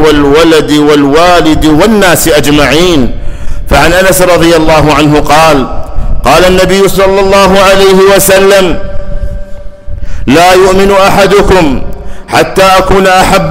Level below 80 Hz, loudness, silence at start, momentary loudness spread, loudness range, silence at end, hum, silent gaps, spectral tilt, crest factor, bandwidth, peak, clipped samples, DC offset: -16 dBFS; -4 LUFS; 0 s; 16 LU; 2 LU; 0 s; none; none; -4.5 dB/octave; 4 dB; 16.5 kHz; 0 dBFS; 0.5%; under 0.1%